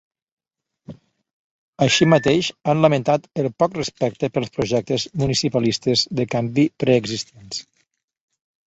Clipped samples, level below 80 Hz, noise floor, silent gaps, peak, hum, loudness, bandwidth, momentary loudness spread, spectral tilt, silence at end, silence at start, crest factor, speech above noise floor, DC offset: under 0.1%; -54 dBFS; -75 dBFS; 1.33-1.73 s; -2 dBFS; none; -20 LUFS; 8.2 kHz; 9 LU; -5 dB/octave; 1.05 s; 0.9 s; 20 dB; 55 dB; under 0.1%